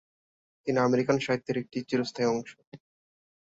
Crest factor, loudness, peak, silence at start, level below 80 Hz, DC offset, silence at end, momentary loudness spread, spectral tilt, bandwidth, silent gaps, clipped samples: 20 dB; -29 LUFS; -10 dBFS; 0.65 s; -70 dBFS; under 0.1%; 0.85 s; 9 LU; -6 dB/octave; 8 kHz; 2.67-2.72 s; under 0.1%